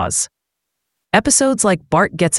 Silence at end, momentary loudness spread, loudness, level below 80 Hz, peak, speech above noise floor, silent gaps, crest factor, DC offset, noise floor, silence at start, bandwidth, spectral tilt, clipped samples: 0 s; 7 LU; -15 LUFS; -44 dBFS; 0 dBFS; 62 dB; none; 18 dB; under 0.1%; -78 dBFS; 0 s; 12 kHz; -3.5 dB/octave; under 0.1%